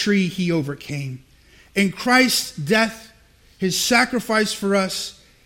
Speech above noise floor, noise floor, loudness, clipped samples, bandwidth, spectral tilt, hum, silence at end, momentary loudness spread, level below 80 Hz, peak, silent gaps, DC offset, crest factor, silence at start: 32 dB; -52 dBFS; -20 LUFS; under 0.1%; 16.5 kHz; -4 dB/octave; none; 0.35 s; 13 LU; -54 dBFS; -2 dBFS; none; under 0.1%; 18 dB; 0 s